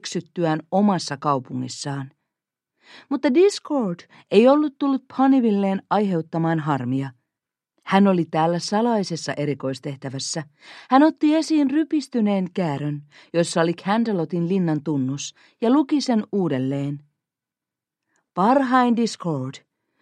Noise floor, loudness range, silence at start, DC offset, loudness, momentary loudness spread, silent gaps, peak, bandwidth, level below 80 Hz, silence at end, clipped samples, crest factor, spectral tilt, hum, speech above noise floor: -88 dBFS; 4 LU; 0.05 s; under 0.1%; -21 LUFS; 13 LU; none; -2 dBFS; 11 kHz; -72 dBFS; 0.45 s; under 0.1%; 20 dB; -6 dB/octave; none; 67 dB